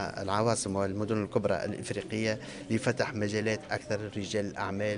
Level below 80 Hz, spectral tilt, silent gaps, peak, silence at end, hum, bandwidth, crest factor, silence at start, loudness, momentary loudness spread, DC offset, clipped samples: -62 dBFS; -5 dB/octave; none; -12 dBFS; 0 s; none; 10 kHz; 18 dB; 0 s; -32 LUFS; 6 LU; under 0.1%; under 0.1%